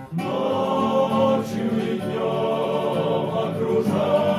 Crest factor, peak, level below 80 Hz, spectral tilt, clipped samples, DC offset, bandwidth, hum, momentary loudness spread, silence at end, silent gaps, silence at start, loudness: 14 dB; -8 dBFS; -60 dBFS; -7 dB/octave; under 0.1%; under 0.1%; 15 kHz; none; 5 LU; 0 s; none; 0 s; -22 LUFS